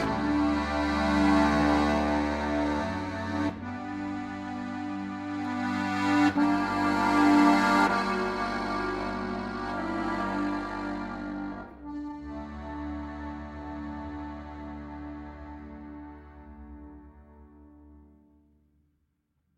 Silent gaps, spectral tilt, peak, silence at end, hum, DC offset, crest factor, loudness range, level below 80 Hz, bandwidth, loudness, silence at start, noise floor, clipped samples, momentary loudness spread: none; -6 dB/octave; -8 dBFS; 1.55 s; none; under 0.1%; 22 dB; 19 LU; -46 dBFS; 11.5 kHz; -28 LUFS; 0 s; -75 dBFS; under 0.1%; 19 LU